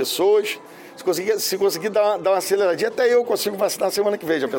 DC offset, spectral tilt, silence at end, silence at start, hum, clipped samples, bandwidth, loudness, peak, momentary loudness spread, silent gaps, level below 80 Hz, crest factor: under 0.1%; -3 dB/octave; 0 s; 0 s; none; under 0.1%; 17 kHz; -20 LUFS; -8 dBFS; 5 LU; none; -70 dBFS; 12 dB